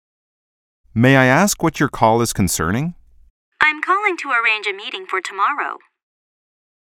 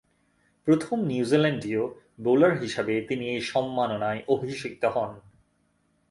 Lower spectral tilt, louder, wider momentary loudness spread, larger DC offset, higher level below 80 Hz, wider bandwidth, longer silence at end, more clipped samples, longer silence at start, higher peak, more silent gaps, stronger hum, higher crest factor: second, -4.5 dB/octave vs -6.5 dB/octave; first, -17 LUFS vs -26 LUFS; first, 12 LU vs 9 LU; neither; first, -46 dBFS vs -64 dBFS; first, 17.5 kHz vs 11.5 kHz; first, 1.2 s vs 0.9 s; neither; first, 0.95 s vs 0.65 s; first, 0 dBFS vs -8 dBFS; first, 3.30-3.52 s vs none; neither; about the same, 20 dB vs 20 dB